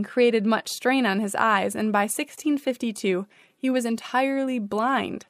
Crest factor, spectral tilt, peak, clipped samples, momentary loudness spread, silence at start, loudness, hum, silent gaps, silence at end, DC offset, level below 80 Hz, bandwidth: 18 dB; -4 dB/octave; -6 dBFS; under 0.1%; 6 LU; 0 s; -24 LUFS; none; none; 0.1 s; under 0.1%; -72 dBFS; 15.5 kHz